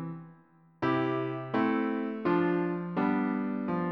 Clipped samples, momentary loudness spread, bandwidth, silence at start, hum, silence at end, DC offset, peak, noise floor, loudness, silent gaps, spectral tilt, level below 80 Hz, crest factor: under 0.1%; 5 LU; 6 kHz; 0 s; none; 0 s; under 0.1%; -16 dBFS; -60 dBFS; -30 LUFS; none; -9.5 dB/octave; -70 dBFS; 14 dB